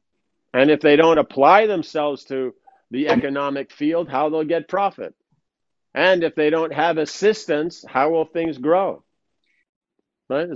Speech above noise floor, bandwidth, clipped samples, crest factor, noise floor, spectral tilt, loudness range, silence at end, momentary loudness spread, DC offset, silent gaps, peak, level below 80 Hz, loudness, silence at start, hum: 61 dB; 7.8 kHz; under 0.1%; 20 dB; -79 dBFS; -5.5 dB/octave; 5 LU; 0 s; 13 LU; under 0.1%; 9.69-9.81 s; 0 dBFS; -62 dBFS; -19 LUFS; 0.55 s; none